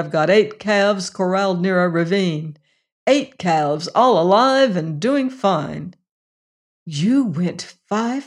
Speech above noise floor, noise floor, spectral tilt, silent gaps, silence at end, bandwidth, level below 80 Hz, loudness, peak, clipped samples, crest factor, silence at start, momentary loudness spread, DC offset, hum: over 72 dB; under -90 dBFS; -5.5 dB/octave; 2.92-3.06 s, 6.11-6.86 s; 0 s; 11 kHz; -64 dBFS; -18 LUFS; -4 dBFS; under 0.1%; 16 dB; 0 s; 11 LU; under 0.1%; none